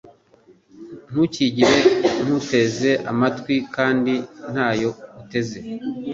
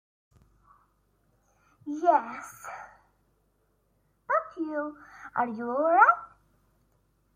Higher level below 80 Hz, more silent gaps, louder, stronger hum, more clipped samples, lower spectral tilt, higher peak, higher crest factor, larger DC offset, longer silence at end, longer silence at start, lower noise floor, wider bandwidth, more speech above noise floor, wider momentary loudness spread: first, -56 dBFS vs -72 dBFS; neither; first, -20 LUFS vs -26 LUFS; neither; neither; about the same, -5 dB/octave vs -5.5 dB/octave; first, -2 dBFS vs -6 dBFS; second, 18 dB vs 24 dB; neither; second, 0 s vs 1.1 s; second, 0.75 s vs 1.85 s; second, -54 dBFS vs -71 dBFS; second, 7.8 kHz vs 15.5 kHz; second, 34 dB vs 45 dB; second, 13 LU vs 22 LU